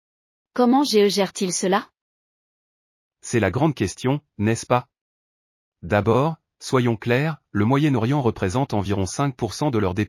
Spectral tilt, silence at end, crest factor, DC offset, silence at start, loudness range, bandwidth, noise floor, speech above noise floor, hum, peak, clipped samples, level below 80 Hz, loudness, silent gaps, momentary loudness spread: -5.5 dB/octave; 0 s; 18 dB; under 0.1%; 0.55 s; 3 LU; 15.5 kHz; under -90 dBFS; over 69 dB; none; -6 dBFS; under 0.1%; -54 dBFS; -22 LUFS; 2.01-3.11 s, 5.01-5.72 s; 7 LU